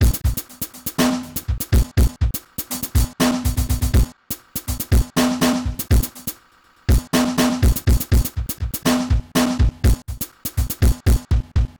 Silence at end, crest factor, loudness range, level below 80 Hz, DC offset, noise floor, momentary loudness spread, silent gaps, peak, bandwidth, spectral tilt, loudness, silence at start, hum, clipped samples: 0.1 s; 12 dB; 2 LU; -22 dBFS; 0.4%; -54 dBFS; 9 LU; none; -8 dBFS; over 20 kHz; -5 dB/octave; -21 LUFS; 0 s; none; under 0.1%